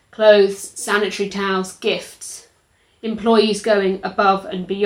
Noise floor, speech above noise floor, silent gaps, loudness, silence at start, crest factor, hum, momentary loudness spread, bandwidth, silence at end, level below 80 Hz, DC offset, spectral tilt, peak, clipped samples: -59 dBFS; 42 dB; none; -18 LUFS; 0.2 s; 18 dB; none; 17 LU; 16 kHz; 0 s; -58 dBFS; under 0.1%; -4 dB/octave; 0 dBFS; under 0.1%